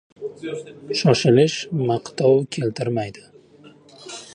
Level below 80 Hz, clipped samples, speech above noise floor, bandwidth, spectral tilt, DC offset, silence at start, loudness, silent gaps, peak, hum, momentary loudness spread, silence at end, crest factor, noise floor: -62 dBFS; under 0.1%; 28 dB; 11 kHz; -6 dB/octave; under 0.1%; 0.2 s; -20 LUFS; none; -2 dBFS; none; 18 LU; 0 s; 20 dB; -49 dBFS